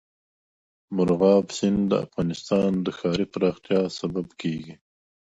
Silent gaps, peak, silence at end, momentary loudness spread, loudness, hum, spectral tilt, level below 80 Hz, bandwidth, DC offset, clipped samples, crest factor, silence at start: none; -6 dBFS; 0.65 s; 11 LU; -24 LUFS; none; -6.5 dB/octave; -56 dBFS; 8 kHz; under 0.1%; under 0.1%; 18 dB; 0.9 s